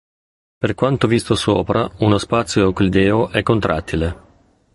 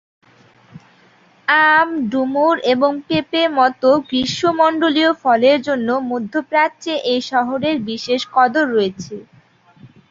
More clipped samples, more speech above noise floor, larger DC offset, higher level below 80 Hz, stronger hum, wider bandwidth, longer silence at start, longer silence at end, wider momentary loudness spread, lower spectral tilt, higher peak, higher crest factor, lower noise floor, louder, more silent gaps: neither; about the same, 37 dB vs 35 dB; neither; first, -36 dBFS vs -58 dBFS; neither; first, 11.5 kHz vs 7.8 kHz; second, 0.6 s vs 0.75 s; first, 0.55 s vs 0.25 s; about the same, 7 LU vs 8 LU; first, -6 dB/octave vs -4.5 dB/octave; about the same, -2 dBFS vs 0 dBFS; about the same, 16 dB vs 16 dB; about the same, -53 dBFS vs -51 dBFS; about the same, -17 LUFS vs -16 LUFS; neither